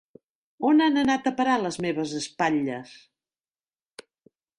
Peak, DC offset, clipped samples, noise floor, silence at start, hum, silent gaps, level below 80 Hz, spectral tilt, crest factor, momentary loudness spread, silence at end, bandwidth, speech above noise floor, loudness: -10 dBFS; under 0.1%; under 0.1%; under -90 dBFS; 0.6 s; none; none; -66 dBFS; -4.5 dB/octave; 16 dB; 10 LU; 1.65 s; 11 kHz; over 66 dB; -24 LUFS